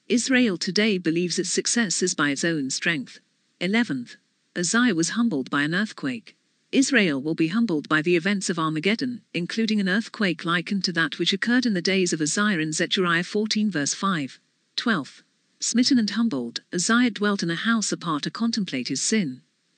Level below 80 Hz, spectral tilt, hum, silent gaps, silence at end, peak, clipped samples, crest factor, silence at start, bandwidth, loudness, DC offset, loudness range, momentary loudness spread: -86 dBFS; -3.5 dB/octave; none; none; 0.4 s; -6 dBFS; under 0.1%; 18 dB; 0.1 s; 9.8 kHz; -23 LUFS; under 0.1%; 2 LU; 8 LU